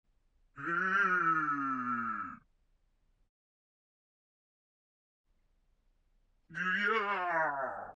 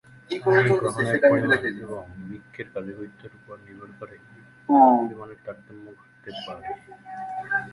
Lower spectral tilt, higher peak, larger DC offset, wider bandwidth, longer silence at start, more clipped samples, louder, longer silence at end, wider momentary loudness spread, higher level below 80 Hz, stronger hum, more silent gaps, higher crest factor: about the same, -5.5 dB/octave vs -6.5 dB/octave; second, -20 dBFS vs -4 dBFS; neither; second, 8 kHz vs 11.5 kHz; first, 0.55 s vs 0.3 s; neither; second, -32 LUFS vs -21 LUFS; about the same, 0.05 s vs 0 s; second, 12 LU vs 25 LU; second, -72 dBFS vs -60 dBFS; neither; first, 3.29-5.24 s vs none; about the same, 18 dB vs 20 dB